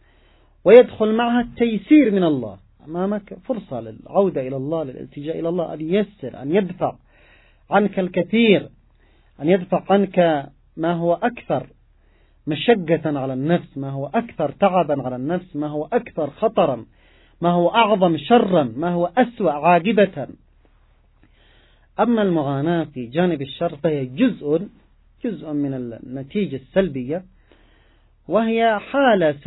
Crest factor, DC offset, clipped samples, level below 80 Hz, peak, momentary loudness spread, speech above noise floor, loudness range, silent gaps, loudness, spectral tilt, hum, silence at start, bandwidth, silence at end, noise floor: 20 dB; under 0.1%; under 0.1%; -54 dBFS; 0 dBFS; 13 LU; 36 dB; 6 LU; none; -20 LUFS; -11 dB/octave; none; 0.65 s; 4.1 kHz; 0.05 s; -55 dBFS